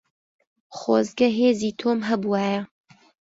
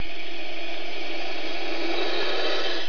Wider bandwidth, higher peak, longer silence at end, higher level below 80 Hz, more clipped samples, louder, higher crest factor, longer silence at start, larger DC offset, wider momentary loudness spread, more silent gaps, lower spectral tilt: first, 8 kHz vs 5.4 kHz; first, -6 dBFS vs -12 dBFS; first, 0.65 s vs 0 s; second, -66 dBFS vs -58 dBFS; neither; first, -23 LUFS vs -29 LUFS; about the same, 18 dB vs 14 dB; first, 0.7 s vs 0 s; second, under 0.1% vs 10%; first, 12 LU vs 8 LU; neither; first, -5.5 dB/octave vs -3.5 dB/octave